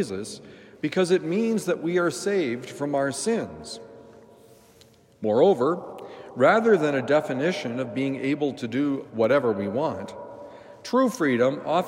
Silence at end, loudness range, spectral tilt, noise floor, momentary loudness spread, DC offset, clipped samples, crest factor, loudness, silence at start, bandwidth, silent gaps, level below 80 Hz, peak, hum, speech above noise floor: 0 s; 5 LU; -5.5 dB/octave; -55 dBFS; 18 LU; under 0.1%; under 0.1%; 18 dB; -24 LUFS; 0 s; 16 kHz; none; -70 dBFS; -6 dBFS; none; 31 dB